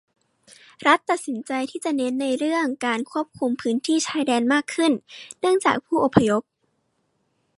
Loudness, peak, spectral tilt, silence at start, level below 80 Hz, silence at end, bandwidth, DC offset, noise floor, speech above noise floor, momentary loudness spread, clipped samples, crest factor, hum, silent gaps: -22 LUFS; 0 dBFS; -4.5 dB/octave; 0.8 s; -58 dBFS; 1.2 s; 11.5 kHz; under 0.1%; -71 dBFS; 49 dB; 7 LU; under 0.1%; 22 dB; none; none